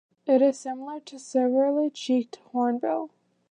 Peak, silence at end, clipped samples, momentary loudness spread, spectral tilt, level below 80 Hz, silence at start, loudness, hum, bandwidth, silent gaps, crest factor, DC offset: -10 dBFS; 0.45 s; under 0.1%; 14 LU; -4.5 dB/octave; -86 dBFS; 0.25 s; -26 LUFS; none; 9.8 kHz; none; 16 dB; under 0.1%